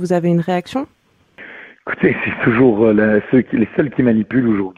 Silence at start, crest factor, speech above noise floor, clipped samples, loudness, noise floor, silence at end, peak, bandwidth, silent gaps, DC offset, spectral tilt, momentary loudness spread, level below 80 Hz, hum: 0 s; 14 dB; 27 dB; under 0.1%; -15 LUFS; -42 dBFS; 0.05 s; -2 dBFS; 10.5 kHz; none; under 0.1%; -8.5 dB/octave; 19 LU; -48 dBFS; none